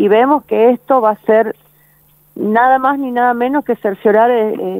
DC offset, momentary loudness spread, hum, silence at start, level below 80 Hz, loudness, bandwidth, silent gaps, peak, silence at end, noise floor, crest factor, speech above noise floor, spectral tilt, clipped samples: under 0.1%; 6 LU; 50 Hz at -50 dBFS; 0 s; -62 dBFS; -13 LUFS; 16 kHz; none; 0 dBFS; 0 s; -51 dBFS; 14 dB; 38 dB; -7.5 dB/octave; under 0.1%